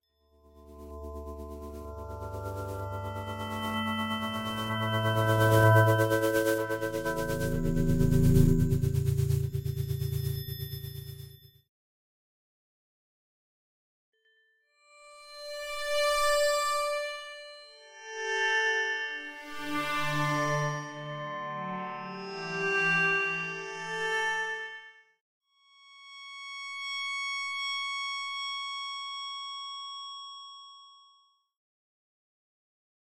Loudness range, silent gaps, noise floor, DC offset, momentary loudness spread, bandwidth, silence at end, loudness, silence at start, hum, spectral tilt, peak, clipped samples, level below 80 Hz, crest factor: 14 LU; 11.69-14.13 s, 25.21-25.41 s; -69 dBFS; under 0.1%; 18 LU; 16 kHz; 2.15 s; -30 LUFS; 0.55 s; none; -5 dB/octave; -8 dBFS; under 0.1%; -44 dBFS; 22 dB